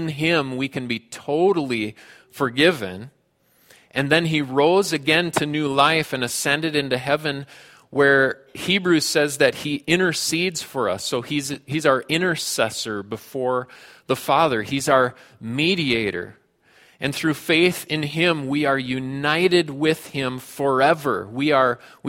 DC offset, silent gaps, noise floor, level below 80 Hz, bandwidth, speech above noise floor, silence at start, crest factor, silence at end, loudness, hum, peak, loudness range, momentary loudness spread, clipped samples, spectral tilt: under 0.1%; none; -61 dBFS; -60 dBFS; 16.5 kHz; 40 dB; 0 s; 22 dB; 0 s; -21 LUFS; none; 0 dBFS; 3 LU; 10 LU; under 0.1%; -4 dB/octave